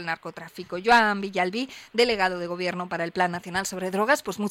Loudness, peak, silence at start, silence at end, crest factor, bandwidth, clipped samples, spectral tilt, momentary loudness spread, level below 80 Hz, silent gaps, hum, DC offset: -25 LUFS; -8 dBFS; 0 s; 0 s; 18 dB; 16.5 kHz; under 0.1%; -4 dB/octave; 13 LU; -60 dBFS; none; none; under 0.1%